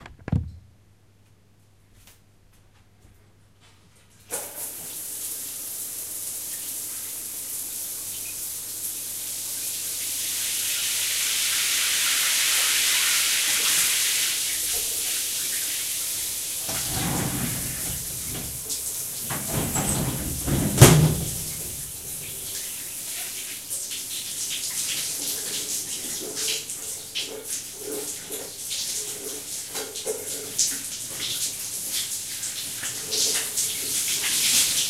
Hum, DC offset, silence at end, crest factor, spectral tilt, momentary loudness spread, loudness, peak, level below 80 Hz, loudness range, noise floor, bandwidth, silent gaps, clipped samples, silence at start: none; under 0.1%; 0 s; 28 dB; -2 dB/octave; 12 LU; -24 LUFS; 0 dBFS; -46 dBFS; 10 LU; -58 dBFS; 16 kHz; none; under 0.1%; 0 s